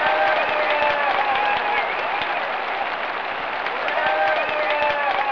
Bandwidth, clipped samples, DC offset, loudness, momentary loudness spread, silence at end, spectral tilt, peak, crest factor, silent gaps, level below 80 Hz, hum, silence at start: 5.4 kHz; under 0.1%; 0.3%; -21 LUFS; 6 LU; 0 s; -3.5 dB/octave; -6 dBFS; 14 dB; none; -58 dBFS; none; 0 s